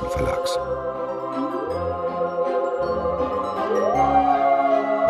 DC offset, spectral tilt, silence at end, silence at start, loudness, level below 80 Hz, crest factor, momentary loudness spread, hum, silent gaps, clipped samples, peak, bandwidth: under 0.1%; -6 dB/octave; 0 s; 0 s; -22 LUFS; -42 dBFS; 14 dB; 8 LU; none; none; under 0.1%; -6 dBFS; 13.5 kHz